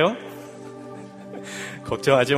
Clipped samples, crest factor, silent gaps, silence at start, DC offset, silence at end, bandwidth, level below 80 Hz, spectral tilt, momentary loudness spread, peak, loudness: under 0.1%; 22 dB; none; 0 s; under 0.1%; 0 s; 15.5 kHz; -58 dBFS; -5 dB/octave; 19 LU; -4 dBFS; -25 LUFS